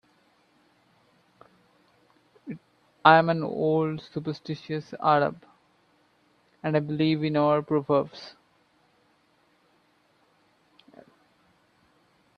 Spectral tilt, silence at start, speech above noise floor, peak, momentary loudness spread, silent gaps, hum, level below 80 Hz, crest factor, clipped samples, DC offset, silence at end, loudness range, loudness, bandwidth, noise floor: -8 dB/octave; 2.45 s; 41 dB; -2 dBFS; 23 LU; none; none; -70 dBFS; 28 dB; under 0.1%; under 0.1%; 4.05 s; 5 LU; -25 LUFS; 6.6 kHz; -66 dBFS